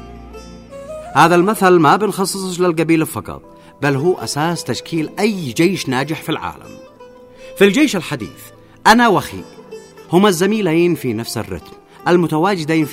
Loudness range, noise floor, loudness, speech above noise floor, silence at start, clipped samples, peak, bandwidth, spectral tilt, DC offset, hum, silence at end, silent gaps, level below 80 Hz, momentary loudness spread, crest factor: 4 LU; -40 dBFS; -15 LUFS; 25 dB; 0 s; under 0.1%; 0 dBFS; 16 kHz; -5 dB/octave; under 0.1%; none; 0 s; none; -48 dBFS; 23 LU; 16 dB